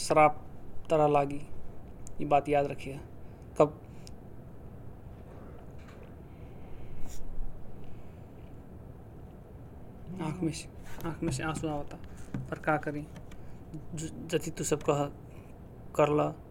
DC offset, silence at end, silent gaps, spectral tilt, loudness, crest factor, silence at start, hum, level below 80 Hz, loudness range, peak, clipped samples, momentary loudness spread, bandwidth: under 0.1%; 0 s; none; -5.5 dB/octave; -31 LUFS; 24 dB; 0 s; none; -48 dBFS; 17 LU; -8 dBFS; under 0.1%; 23 LU; 16.5 kHz